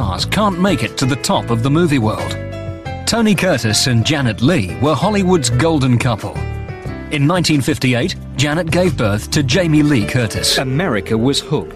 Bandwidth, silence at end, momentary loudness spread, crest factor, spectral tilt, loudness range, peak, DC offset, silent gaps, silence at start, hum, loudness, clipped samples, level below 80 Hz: 14.5 kHz; 0 s; 9 LU; 12 dB; -5 dB/octave; 2 LU; -4 dBFS; under 0.1%; none; 0 s; none; -15 LUFS; under 0.1%; -34 dBFS